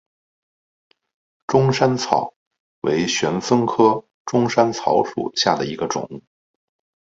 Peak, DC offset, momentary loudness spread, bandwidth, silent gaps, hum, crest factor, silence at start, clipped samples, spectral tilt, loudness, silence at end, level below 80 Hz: 0 dBFS; under 0.1%; 10 LU; 7.8 kHz; 2.36-2.51 s, 2.60-2.82 s, 4.14-4.25 s; none; 20 dB; 1.5 s; under 0.1%; -5 dB/octave; -19 LUFS; 0.8 s; -58 dBFS